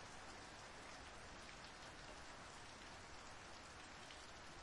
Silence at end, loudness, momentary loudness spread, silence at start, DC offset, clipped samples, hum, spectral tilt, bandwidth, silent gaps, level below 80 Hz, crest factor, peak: 0 s; -56 LUFS; 1 LU; 0 s; under 0.1%; under 0.1%; none; -2.5 dB/octave; 12 kHz; none; -68 dBFS; 16 dB; -40 dBFS